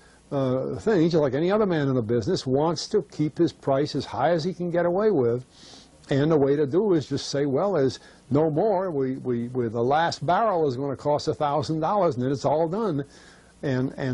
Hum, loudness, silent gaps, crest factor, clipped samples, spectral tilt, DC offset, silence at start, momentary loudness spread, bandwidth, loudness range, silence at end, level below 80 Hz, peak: none; -24 LUFS; none; 16 dB; under 0.1%; -7 dB/octave; under 0.1%; 0.3 s; 6 LU; 11 kHz; 1 LU; 0 s; -56 dBFS; -8 dBFS